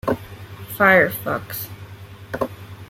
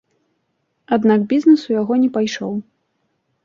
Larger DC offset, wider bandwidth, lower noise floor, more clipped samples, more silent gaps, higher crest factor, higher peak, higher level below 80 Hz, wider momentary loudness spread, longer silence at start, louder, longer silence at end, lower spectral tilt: neither; first, 16.5 kHz vs 7.2 kHz; second, -39 dBFS vs -69 dBFS; neither; neither; about the same, 20 dB vs 16 dB; about the same, -2 dBFS vs -2 dBFS; first, -52 dBFS vs -64 dBFS; first, 24 LU vs 11 LU; second, 0.05 s vs 0.9 s; second, -20 LUFS vs -17 LUFS; second, 0.05 s vs 0.85 s; about the same, -5.5 dB/octave vs -6.5 dB/octave